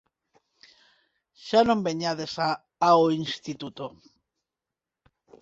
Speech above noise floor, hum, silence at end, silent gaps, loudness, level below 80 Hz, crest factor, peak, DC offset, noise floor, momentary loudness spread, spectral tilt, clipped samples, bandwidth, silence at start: 64 dB; none; 1.5 s; none; -25 LUFS; -64 dBFS; 22 dB; -6 dBFS; under 0.1%; -89 dBFS; 17 LU; -5.5 dB/octave; under 0.1%; 8 kHz; 1.4 s